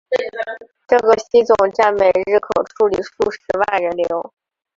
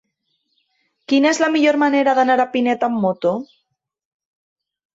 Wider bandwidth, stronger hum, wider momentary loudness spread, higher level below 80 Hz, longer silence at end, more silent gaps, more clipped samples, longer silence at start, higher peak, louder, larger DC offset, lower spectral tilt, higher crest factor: about the same, 7.6 kHz vs 8 kHz; neither; first, 12 LU vs 6 LU; first, -52 dBFS vs -68 dBFS; second, 0.5 s vs 1.5 s; neither; neither; second, 0.1 s vs 1.1 s; about the same, -2 dBFS vs -4 dBFS; about the same, -17 LUFS vs -17 LUFS; neither; about the same, -4.5 dB/octave vs -4.5 dB/octave; about the same, 16 dB vs 16 dB